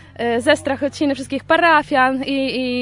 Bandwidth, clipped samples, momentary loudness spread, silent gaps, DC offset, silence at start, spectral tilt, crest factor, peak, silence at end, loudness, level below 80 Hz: 11 kHz; under 0.1%; 8 LU; none; under 0.1%; 0.2 s; -4 dB/octave; 16 dB; -2 dBFS; 0 s; -17 LUFS; -52 dBFS